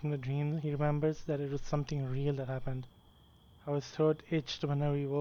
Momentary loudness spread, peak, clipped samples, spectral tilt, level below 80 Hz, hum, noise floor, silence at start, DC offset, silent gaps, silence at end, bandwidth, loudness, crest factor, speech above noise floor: 7 LU; -20 dBFS; under 0.1%; -7.5 dB/octave; -52 dBFS; none; -61 dBFS; 0 s; under 0.1%; none; 0 s; 7 kHz; -35 LUFS; 16 dB; 28 dB